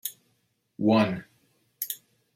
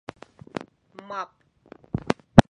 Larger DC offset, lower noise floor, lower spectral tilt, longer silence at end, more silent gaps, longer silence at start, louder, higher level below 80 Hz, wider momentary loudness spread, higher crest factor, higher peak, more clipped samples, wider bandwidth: neither; first, -72 dBFS vs -52 dBFS; second, -5.5 dB/octave vs -7 dB/octave; first, 0.4 s vs 0.1 s; neither; second, 0.05 s vs 1.1 s; second, -28 LUFS vs -25 LUFS; second, -72 dBFS vs -42 dBFS; second, 15 LU vs 26 LU; about the same, 22 dB vs 24 dB; second, -8 dBFS vs 0 dBFS; neither; first, 16.5 kHz vs 11 kHz